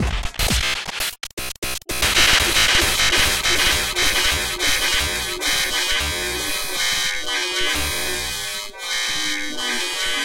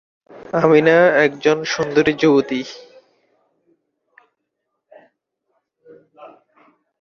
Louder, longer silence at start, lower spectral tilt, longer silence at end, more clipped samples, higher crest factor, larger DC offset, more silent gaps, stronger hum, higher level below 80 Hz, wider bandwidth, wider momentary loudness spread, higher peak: second, -19 LUFS vs -15 LUFS; second, 0 s vs 0.5 s; second, -1 dB/octave vs -5.5 dB/octave; second, 0 s vs 0.75 s; neither; about the same, 18 dB vs 18 dB; neither; first, 1.33-1.37 s, 1.58-1.62 s vs none; neither; first, -32 dBFS vs -60 dBFS; first, 17 kHz vs 7 kHz; second, 10 LU vs 13 LU; about the same, -4 dBFS vs -2 dBFS